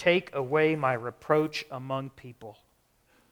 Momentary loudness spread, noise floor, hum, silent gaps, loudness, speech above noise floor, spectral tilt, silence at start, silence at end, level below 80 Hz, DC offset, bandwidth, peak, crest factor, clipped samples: 21 LU; -67 dBFS; none; none; -28 LUFS; 39 dB; -6 dB/octave; 0 s; 0.8 s; -68 dBFS; under 0.1%; 19 kHz; -8 dBFS; 22 dB; under 0.1%